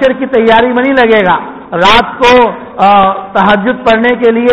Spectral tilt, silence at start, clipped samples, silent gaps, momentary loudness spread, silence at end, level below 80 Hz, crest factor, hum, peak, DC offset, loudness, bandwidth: -5.5 dB/octave; 0 s; 0.6%; none; 5 LU; 0 s; -36 dBFS; 8 dB; none; 0 dBFS; under 0.1%; -8 LUFS; 9.6 kHz